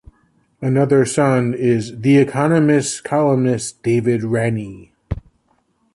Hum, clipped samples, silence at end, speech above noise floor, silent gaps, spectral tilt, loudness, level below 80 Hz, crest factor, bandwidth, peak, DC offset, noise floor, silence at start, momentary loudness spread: none; under 0.1%; 0.75 s; 46 dB; none; -6.5 dB/octave; -17 LUFS; -44 dBFS; 14 dB; 11.5 kHz; -4 dBFS; under 0.1%; -62 dBFS; 0.6 s; 13 LU